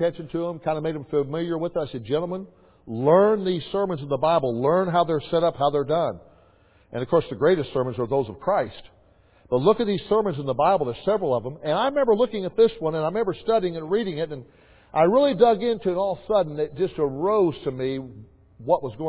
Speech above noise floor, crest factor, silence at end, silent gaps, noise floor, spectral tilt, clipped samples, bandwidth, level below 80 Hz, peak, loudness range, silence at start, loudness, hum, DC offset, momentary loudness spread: 34 dB; 18 dB; 0 s; none; -57 dBFS; -10.5 dB/octave; under 0.1%; 4 kHz; -56 dBFS; -6 dBFS; 3 LU; 0 s; -23 LUFS; none; under 0.1%; 10 LU